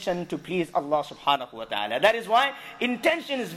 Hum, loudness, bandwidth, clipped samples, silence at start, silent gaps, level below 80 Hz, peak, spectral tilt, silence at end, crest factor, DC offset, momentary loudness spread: none; -25 LUFS; 15.5 kHz; under 0.1%; 0 s; none; -64 dBFS; -8 dBFS; -4 dB/octave; 0 s; 18 dB; under 0.1%; 8 LU